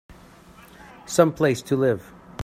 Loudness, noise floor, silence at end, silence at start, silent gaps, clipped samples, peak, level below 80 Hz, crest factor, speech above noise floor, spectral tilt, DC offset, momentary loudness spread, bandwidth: -22 LUFS; -48 dBFS; 0 s; 1.05 s; none; under 0.1%; -2 dBFS; -56 dBFS; 22 dB; 28 dB; -5.5 dB/octave; under 0.1%; 19 LU; 16 kHz